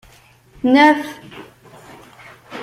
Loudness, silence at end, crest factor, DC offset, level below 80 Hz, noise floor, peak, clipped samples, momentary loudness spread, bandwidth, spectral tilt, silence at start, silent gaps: -14 LUFS; 0 s; 18 dB; under 0.1%; -56 dBFS; -49 dBFS; -2 dBFS; under 0.1%; 26 LU; 15 kHz; -4.5 dB/octave; 0.65 s; none